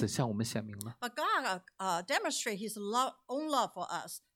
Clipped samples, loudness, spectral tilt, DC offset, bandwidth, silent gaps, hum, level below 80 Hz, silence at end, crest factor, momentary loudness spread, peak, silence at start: under 0.1%; -35 LUFS; -4 dB/octave; under 0.1%; 17.5 kHz; none; none; -74 dBFS; 0.15 s; 18 dB; 8 LU; -18 dBFS; 0 s